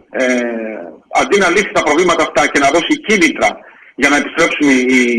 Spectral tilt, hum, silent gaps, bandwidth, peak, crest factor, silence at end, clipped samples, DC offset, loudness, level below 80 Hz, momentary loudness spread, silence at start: -3 dB/octave; none; none; 14.5 kHz; 0 dBFS; 14 dB; 0 s; under 0.1%; under 0.1%; -12 LUFS; -46 dBFS; 8 LU; 0.15 s